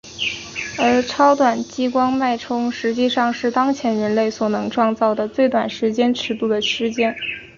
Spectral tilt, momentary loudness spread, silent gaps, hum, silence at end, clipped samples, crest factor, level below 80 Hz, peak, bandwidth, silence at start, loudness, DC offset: -4.5 dB/octave; 6 LU; none; none; 0.1 s; under 0.1%; 16 dB; -56 dBFS; -2 dBFS; 7.4 kHz; 0.05 s; -19 LUFS; under 0.1%